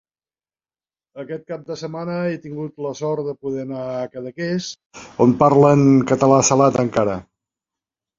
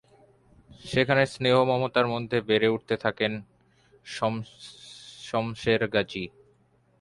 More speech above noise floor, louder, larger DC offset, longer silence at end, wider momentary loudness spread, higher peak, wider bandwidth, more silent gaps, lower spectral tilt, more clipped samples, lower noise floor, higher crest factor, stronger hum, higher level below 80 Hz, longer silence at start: first, over 72 dB vs 38 dB; first, -18 LUFS vs -26 LUFS; neither; first, 0.95 s vs 0.75 s; about the same, 18 LU vs 20 LU; first, -2 dBFS vs -8 dBFS; second, 7.6 kHz vs 11.5 kHz; first, 4.86-4.90 s vs none; about the same, -6 dB/octave vs -5.5 dB/octave; neither; first, under -90 dBFS vs -64 dBFS; about the same, 18 dB vs 20 dB; neither; first, -54 dBFS vs -60 dBFS; first, 1.15 s vs 0.85 s